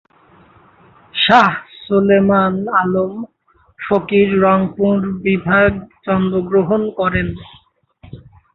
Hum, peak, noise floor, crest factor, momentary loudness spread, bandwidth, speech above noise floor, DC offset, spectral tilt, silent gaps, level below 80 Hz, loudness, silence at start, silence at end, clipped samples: none; 0 dBFS; -49 dBFS; 16 dB; 14 LU; 7 kHz; 34 dB; under 0.1%; -7.5 dB/octave; none; -42 dBFS; -15 LUFS; 1.15 s; 0.35 s; under 0.1%